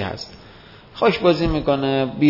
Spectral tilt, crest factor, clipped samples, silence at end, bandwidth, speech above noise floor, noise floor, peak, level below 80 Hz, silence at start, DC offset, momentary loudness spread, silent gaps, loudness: -7 dB/octave; 18 dB; under 0.1%; 0 s; 5.8 kHz; 26 dB; -44 dBFS; -2 dBFS; -38 dBFS; 0 s; under 0.1%; 16 LU; none; -19 LUFS